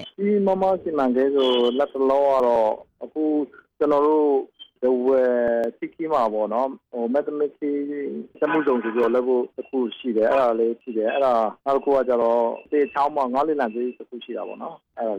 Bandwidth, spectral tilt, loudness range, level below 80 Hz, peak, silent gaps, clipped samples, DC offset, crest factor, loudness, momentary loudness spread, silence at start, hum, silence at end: 7.8 kHz; -7 dB/octave; 3 LU; -64 dBFS; -10 dBFS; none; under 0.1%; under 0.1%; 10 dB; -22 LUFS; 11 LU; 0 s; none; 0 s